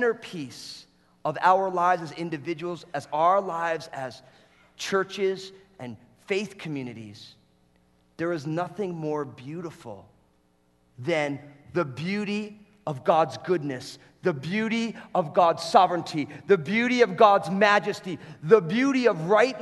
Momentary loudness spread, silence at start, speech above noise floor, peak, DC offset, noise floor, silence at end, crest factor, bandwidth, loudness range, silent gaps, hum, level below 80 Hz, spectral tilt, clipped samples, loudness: 18 LU; 0 s; 40 dB; -4 dBFS; under 0.1%; -65 dBFS; 0 s; 22 dB; 12 kHz; 12 LU; none; none; -70 dBFS; -5.5 dB/octave; under 0.1%; -25 LUFS